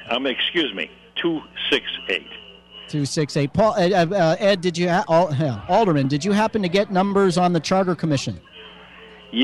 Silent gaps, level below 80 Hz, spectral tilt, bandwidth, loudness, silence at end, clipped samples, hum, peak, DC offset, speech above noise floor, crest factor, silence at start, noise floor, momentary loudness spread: none; -54 dBFS; -5.5 dB/octave; 12 kHz; -20 LUFS; 0 s; under 0.1%; none; -6 dBFS; under 0.1%; 24 dB; 16 dB; 0 s; -44 dBFS; 12 LU